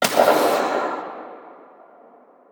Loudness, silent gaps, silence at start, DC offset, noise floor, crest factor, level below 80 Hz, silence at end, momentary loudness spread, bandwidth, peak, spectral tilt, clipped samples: -20 LUFS; none; 0 s; under 0.1%; -50 dBFS; 20 dB; -68 dBFS; 0.95 s; 22 LU; over 20 kHz; -2 dBFS; -2.5 dB/octave; under 0.1%